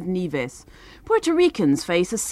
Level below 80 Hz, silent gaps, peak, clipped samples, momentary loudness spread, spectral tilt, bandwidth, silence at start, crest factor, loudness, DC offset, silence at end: -52 dBFS; none; -8 dBFS; under 0.1%; 9 LU; -4.5 dB/octave; 14 kHz; 0 s; 14 dB; -21 LUFS; under 0.1%; 0 s